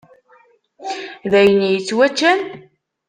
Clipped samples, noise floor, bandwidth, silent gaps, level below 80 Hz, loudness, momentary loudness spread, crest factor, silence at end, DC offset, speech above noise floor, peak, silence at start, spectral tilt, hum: under 0.1%; -53 dBFS; 9.6 kHz; none; -60 dBFS; -16 LUFS; 16 LU; 16 dB; 0.5 s; under 0.1%; 39 dB; -2 dBFS; 0.8 s; -4.5 dB/octave; none